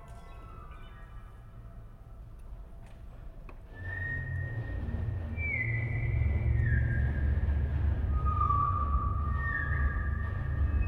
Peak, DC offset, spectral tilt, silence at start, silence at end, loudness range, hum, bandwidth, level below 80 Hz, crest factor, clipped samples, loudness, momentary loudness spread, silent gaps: -18 dBFS; under 0.1%; -9 dB/octave; 0 s; 0 s; 20 LU; none; 3.9 kHz; -36 dBFS; 14 dB; under 0.1%; -32 LUFS; 22 LU; none